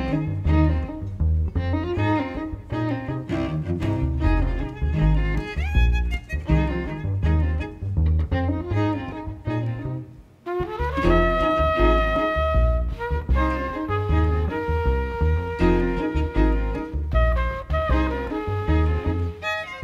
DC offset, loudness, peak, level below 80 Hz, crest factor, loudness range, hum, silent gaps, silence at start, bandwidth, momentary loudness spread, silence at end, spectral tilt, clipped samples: under 0.1%; -24 LUFS; -6 dBFS; -26 dBFS; 16 dB; 3 LU; none; none; 0 s; 7.2 kHz; 8 LU; 0 s; -8.5 dB/octave; under 0.1%